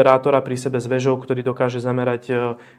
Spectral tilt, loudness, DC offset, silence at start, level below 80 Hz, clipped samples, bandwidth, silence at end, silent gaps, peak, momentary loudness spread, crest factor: -6.5 dB/octave; -20 LUFS; under 0.1%; 0 s; -64 dBFS; under 0.1%; 12.5 kHz; 0.15 s; none; 0 dBFS; 6 LU; 20 dB